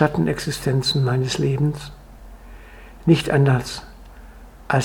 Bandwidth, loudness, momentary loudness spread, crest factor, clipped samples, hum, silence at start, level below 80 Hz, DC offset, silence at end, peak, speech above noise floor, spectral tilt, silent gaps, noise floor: 17 kHz; -20 LUFS; 14 LU; 20 dB; under 0.1%; none; 0 s; -42 dBFS; under 0.1%; 0 s; -2 dBFS; 22 dB; -6 dB/octave; none; -41 dBFS